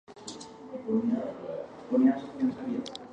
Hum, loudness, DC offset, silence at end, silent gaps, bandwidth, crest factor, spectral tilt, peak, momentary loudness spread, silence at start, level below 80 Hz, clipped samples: none; -30 LUFS; under 0.1%; 0 s; none; 9.4 kHz; 18 dB; -6 dB/octave; -12 dBFS; 18 LU; 0.1 s; -70 dBFS; under 0.1%